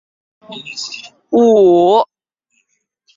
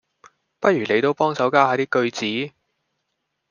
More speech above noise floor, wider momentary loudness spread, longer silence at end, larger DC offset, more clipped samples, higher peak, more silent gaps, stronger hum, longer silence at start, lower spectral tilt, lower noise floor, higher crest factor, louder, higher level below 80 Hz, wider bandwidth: about the same, 54 dB vs 57 dB; first, 22 LU vs 7 LU; about the same, 1.1 s vs 1 s; neither; neither; about the same, -2 dBFS vs -2 dBFS; neither; neither; about the same, 0.5 s vs 0.6 s; about the same, -5.5 dB/octave vs -5 dB/octave; second, -66 dBFS vs -76 dBFS; second, 14 dB vs 20 dB; first, -12 LUFS vs -20 LUFS; first, -60 dBFS vs -70 dBFS; about the same, 7.6 kHz vs 7.2 kHz